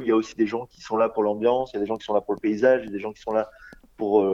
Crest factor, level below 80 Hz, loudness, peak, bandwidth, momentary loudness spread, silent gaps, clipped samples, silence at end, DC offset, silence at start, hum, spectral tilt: 18 dB; -60 dBFS; -24 LUFS; -6 dBFS; 7.6 kHz; 11 LU; none; under 0.1%; 0 s; under 0.1%; 0 s; none; -6.5 dB/octave